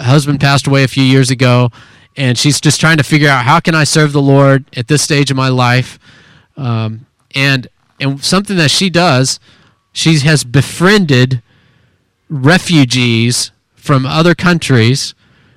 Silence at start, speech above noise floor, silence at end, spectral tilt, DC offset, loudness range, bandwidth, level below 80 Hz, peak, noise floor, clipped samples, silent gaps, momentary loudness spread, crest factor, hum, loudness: 0 s; 45 dB; 0.45 s; -5 dB/octave; under 0.1%; 4 LU; 15 kHz; -44 dBFS; 0 dBFS; -55 dBFS; 0.2%; none; 10 LU; 12 dB; none; -10 LUFS